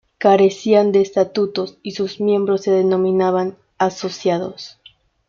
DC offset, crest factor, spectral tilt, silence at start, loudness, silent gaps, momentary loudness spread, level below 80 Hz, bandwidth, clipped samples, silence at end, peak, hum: under 0.1%; 16 dB; -6 dB/octave; 0.2 s; -18 LUFS; none; 12 LU; -62 dBFS; 7.2 kHz; under 0.1%; 0.6 s; -2 dBFS; none